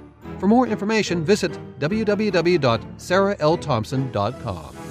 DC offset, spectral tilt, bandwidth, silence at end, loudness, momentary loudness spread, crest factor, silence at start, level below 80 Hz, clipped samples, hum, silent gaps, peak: under 0.1%; -6 dB/octave; 14.5 kHz; 0 s; -21 LUFS; 9 LU; 16 dB; 0 s; -48 dBFS; under 0.1%; none; none; -6 dBFS